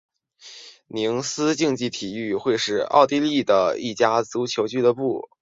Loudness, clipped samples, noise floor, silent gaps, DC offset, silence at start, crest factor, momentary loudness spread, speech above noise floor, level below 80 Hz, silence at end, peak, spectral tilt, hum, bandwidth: -22 LUFS; under 0.1%; -47 dBFS; none; under 0.1%; 0.45 s; 20 dB; 11 LU; 25 dB; -64 dBFS; 0.2 s; -2 dBFS; -4 dB/octave; none; 7.8 kHz